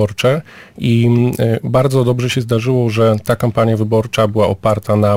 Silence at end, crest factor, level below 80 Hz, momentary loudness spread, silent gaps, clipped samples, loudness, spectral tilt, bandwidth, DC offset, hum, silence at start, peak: 0 s; 12 dB; -44 dBFS; 3 LU; none; under 0.1%; -15 LUFS; -7 dB/octave; 16 kHz; under 0.1%; none; 0 s; -2 dBFS